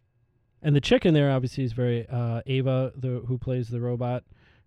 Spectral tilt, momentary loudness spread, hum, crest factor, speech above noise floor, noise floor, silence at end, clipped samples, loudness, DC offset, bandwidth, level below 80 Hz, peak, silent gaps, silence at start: -7.5 dB/octave; 10 LU; none; 18 dB; 43 dB; -67 dBFS; 0.45 s; under 0.1%; -26 LUFS; under 0.1%; 9.2 kHz; -50 dBFS; -8 dBFS; none; 0.65 s